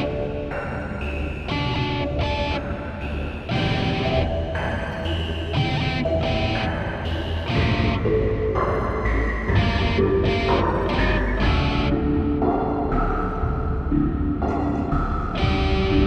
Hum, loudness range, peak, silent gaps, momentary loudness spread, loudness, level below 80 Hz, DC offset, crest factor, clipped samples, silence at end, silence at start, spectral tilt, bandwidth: none; 4 LU; -6 dBFS; none; 7 LU; -23 LUFS; -28 dBFS; under 0.1%; 14 dB; under 0.1%; 0 s; 0 s; -7.5 dB/octave; 8.4 kHz